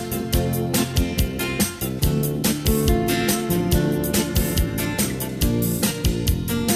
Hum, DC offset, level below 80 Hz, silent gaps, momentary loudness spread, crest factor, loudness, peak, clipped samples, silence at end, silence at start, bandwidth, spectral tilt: none; under 0.1%; -28 dBFS; none; 3 LU; 16 dB; -22 LUFS; -6 dBFS; under 0.1%; 0 s; 0 s; 17 kHz; -4.5 dB/octave